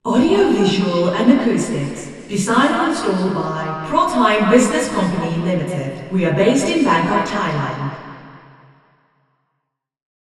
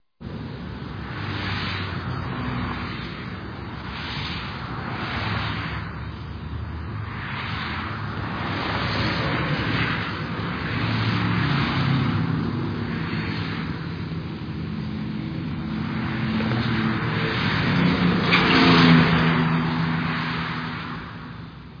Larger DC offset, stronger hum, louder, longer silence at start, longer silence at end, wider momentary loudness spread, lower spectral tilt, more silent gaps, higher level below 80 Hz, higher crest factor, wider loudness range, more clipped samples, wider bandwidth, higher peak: neither; neither; first, -17 LUFS vs -24 LUFS; second, 0.05 s vs 0.2 s; first, 1.95 s vs 0 s; second, 10 LU vs 14 LU; second, -5.5 dB/octave vs -7 dB/octave; neither; second, -50 dBFS vs -42 dBFS; about the same, 18 dB vs 20 dB; second, 5 LU vs 11 LU; neither; first, 12.5 kHz vs 5.2 kHz; first, 0 dBFS vs -4 dBFS